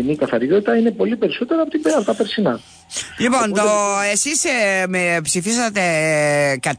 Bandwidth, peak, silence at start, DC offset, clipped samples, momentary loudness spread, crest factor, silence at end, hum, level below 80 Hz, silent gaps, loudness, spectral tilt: 11 kHz; -4 dBFS; 0 s; under 0.1%; under 0.1%; 4 LU; 12 dB; 0 s; none; -56 dBFS; none; -17 LUFS; -3.5 dB/octave